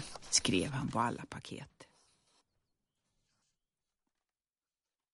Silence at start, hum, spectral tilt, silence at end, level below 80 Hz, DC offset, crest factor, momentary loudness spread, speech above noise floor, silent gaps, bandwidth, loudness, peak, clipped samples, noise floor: 0 s; none; -3 dB/octave; 3.3 s; -66 dBFS; under 0.1%; 26 dB; 19 LU; over 54 dB; none; 11.5 kHz; -33 LUFS; -14 dBFS; under 0.1%; under -90 dBFS